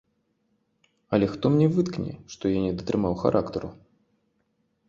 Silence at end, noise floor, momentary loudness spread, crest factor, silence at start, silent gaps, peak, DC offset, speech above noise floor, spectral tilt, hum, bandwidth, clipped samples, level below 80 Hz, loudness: 1.15 s; -72 dBFS; 12 LU; 20 dB; 1.1 s; none; -6 dBFS; under 0.1%; 48 dB; -8 dB/octave; none; 7.6 kHz; under 0.1%; -52 dBFS; -25 LUFS